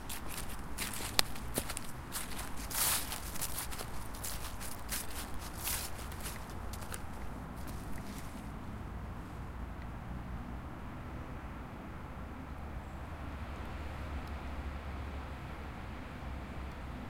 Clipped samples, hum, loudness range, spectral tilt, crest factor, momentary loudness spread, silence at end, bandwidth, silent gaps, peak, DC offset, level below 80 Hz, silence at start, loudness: under 0.1%; none; 9 LU; -3 dB/octave; 38 dB; 10 LU; 0 s; 17 kHz; none; -2 dBFS; under 0.1%; -46 dBFS; 0 s; -41 LUFS